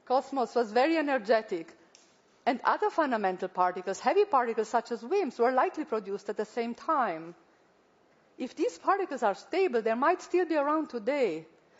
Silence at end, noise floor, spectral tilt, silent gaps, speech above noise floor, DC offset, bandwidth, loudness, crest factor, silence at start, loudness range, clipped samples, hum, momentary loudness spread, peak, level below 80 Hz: 0.35 s; -65 dBFS; -4.5 dB/octave; none; 36 dB; under 0.1%; 8 kHz; -29 LUFS; 18 dB; 0.1 s; 4 LU; under 0.1%; none; 8 LU; -12 dBFS; -82 dBFS